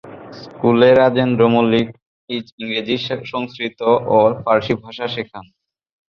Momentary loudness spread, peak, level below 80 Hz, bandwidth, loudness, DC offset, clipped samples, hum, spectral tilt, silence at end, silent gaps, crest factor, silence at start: 15 LU; -2 dBFS; -54 dBFS; 6.6 kHz; -17 LUFS; under 0.1%; under 0.1%; none; -7.5 dB/octave; 0.7 s; 2.02-2.28 s, 2.52-2.58 s; 16 dB; 0.05 s